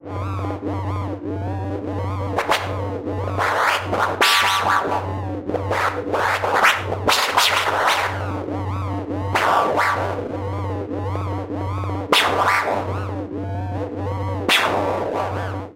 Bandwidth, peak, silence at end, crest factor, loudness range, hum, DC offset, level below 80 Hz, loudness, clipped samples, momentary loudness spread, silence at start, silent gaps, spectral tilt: 16 kHz; -4 dBFS; 0.05 s; 18 dB; 4 LU; none; under 0.1%; -48 dBFS; -21 LUFS; under 0.1%; 11 LU; 0.05 s; none; -4 dB/octave